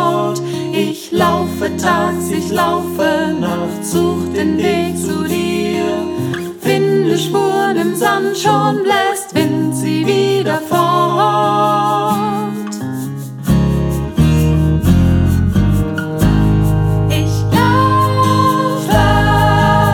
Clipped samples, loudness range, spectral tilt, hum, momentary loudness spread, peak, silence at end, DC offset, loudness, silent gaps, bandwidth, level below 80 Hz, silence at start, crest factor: under 0.1%; 3 LU; -6 dB/octave; none; 7 LU; -2 dBFS; 0 s; under 0.1%; -14 LUFS; none; 19 kHz; -28 dBFS; 0 s; 12 dB